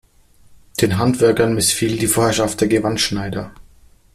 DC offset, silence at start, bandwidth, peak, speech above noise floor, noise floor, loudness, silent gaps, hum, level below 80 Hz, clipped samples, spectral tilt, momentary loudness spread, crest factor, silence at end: under 0.1%; 0.5 s; 16 kHz; -2 dBFS; 33 dB; -50 dBFS; -17 LUFS; none; none; -44 dBFS; under 0.1%; -4 dB/octave; 12 LU; 16 dB; 0.55 s